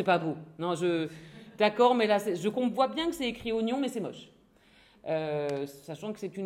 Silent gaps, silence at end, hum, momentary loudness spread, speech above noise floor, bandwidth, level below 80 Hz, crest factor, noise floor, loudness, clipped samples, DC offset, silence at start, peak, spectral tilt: none; 0 s; none; 16 LU; 32 dB; 16.5 kHz; -66 dBFS; 18 dB; -61 dBFS; -30 LUFS; under 0.1%; under 0.1%; 0 s; -12 dBFS; -5.5 dB/octave